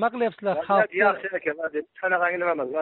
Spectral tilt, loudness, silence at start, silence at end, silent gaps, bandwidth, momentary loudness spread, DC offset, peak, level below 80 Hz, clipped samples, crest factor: -3 dB/octave; -24 LUFS; 0 s; 0 s; none; 4.3 kHz; 7 LU; under 0.1%; -8 dBFS; -72 dBFS; under 0.1%; 16 dB